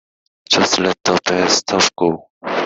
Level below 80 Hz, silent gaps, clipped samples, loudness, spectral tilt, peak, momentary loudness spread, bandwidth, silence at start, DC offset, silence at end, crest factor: -56 dBFS; 2.30-2.41 s; under 0.1%; -15 LUFS; -2.5 dB/octave; 0 dBFS; 6 LU; 8.4 kHz; 0.5 s; under 0.1%; 0 s; 16 dB